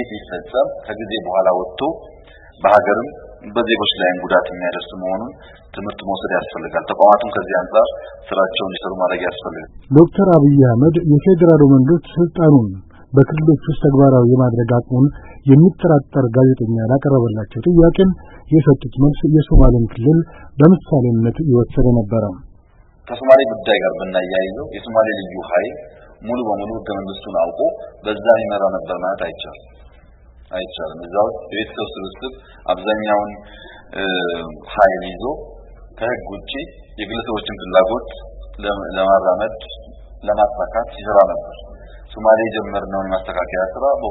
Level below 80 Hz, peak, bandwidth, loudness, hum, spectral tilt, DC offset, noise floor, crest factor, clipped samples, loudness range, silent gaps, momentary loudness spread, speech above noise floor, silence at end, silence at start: -30 dBFS; 0 dBFS; 4.1 kHz; -16 LUFS; none; -10.5 dB/octave; under 0.1%; -48 dBFS; 16 dB; under 0.1%; 9 LU; none; 17 LU; 32 dB; 0 s; 0 s